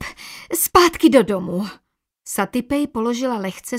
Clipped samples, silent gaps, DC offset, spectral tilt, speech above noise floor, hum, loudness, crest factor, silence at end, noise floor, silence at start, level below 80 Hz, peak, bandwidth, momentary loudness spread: under 0.1%; none; under 0.1%; -4 dB/octave; 18 dB; none; -18 LUFS; 20 dB; 0 s; -38 dBFS; 0 s; -48 dBFS; 0 dBFS; 16 kHz; 14 LU